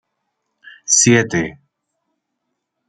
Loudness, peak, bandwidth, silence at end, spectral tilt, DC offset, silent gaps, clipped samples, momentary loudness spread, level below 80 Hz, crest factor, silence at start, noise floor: -14 LUFS; -2 dBFS; 10.5 kHz; 1.35 s; -3 dB/octave; under 0.1%; none; under 0.1%; 17 LU; -56 dBFS; 18 dB; 0.9 s; -75 dBFS